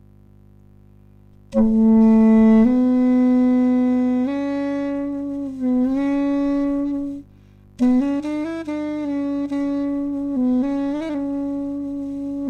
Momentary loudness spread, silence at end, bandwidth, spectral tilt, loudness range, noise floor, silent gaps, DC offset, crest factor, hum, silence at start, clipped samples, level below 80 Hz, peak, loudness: 13 LU; 0 s; 6.8 kHz; -8.5 dB/octave; 7 LU; -48 dBFS; none; under 0.1%; 14 dB; 50 Hz at -50 dBFS; 1.5 s; under 0.1%; -44 dBFS; -6 dBFS; -19 LUFS